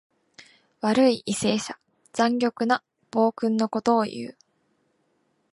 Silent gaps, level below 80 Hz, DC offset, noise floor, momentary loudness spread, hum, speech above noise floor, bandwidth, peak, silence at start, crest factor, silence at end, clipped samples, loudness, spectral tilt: none; -68 dBFS; under 0.1%; -70 dBFS; 14 LU; none; 47 dB; 11.5 kHz; -8 dBFS; 0.85 s; 18 dB; 1.2 s; under 0.1%; -24 LUFS; -4.5 dB/octave